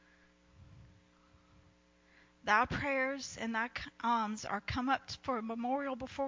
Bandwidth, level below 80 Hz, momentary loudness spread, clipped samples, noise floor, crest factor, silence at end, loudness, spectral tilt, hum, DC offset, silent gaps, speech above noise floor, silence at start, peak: 7.6 kHz; -60 dBFS; 9 LU; under 0.1%; -67 dBFS; 22 dB; 0 s; -35 LUFS; -4.5 dB/octave; none; under 0.1%; none; 31 dB; 0.6 s; -14 dBFS